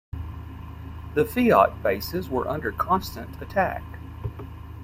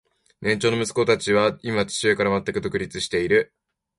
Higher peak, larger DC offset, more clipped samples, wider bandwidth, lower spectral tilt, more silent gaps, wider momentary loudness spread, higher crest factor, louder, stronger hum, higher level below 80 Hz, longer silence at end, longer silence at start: about the same, -4 dBFS vs -6 dBFS; neither; neither; first, 16.5 kHz vs 11.5 kHz; first, -6.5 dB/octave vs -4.5 dB/octave; neither; first, 20 LU vs 7 LU; about the same, 22 dB vs 18 dB; about the same, -24 LUFS vs -22 LUFS; neither; first, -42 dBFS vs -52 dBFS; second, 0 s vs 0.55 s; second, 0.15 s vs 0.4 s